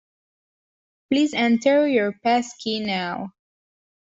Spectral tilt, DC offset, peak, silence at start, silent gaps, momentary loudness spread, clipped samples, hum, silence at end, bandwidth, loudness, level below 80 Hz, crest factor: -4.5 dB/octave; under 0.1%; -8 dBFS; 1.1 s; none; 10 LU; under 0.1%; none; 0.8 s; 8 kHz; -21 LUFS; -66 dBFS; 16 dB